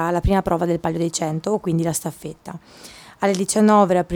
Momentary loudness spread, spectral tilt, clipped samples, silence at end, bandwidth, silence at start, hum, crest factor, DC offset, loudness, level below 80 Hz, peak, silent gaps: 22 LU; -5.5 dB/octave; under 0.1%; 0 s; 19 kHz; 0 s; none; 16 dB; under 0.1%; -20 LUFS; -36 dBFS; -4 dBFS; none